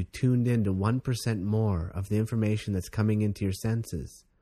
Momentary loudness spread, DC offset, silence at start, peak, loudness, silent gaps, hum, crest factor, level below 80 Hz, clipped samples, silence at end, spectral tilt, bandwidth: 6 LU; under 0.1%; 0 s; -12 dBFS; -28 LUFS; none; none; 16 dB; -48 dBFS; under 0.1%; 0.25 s; -7 dB/octave; 14 kHz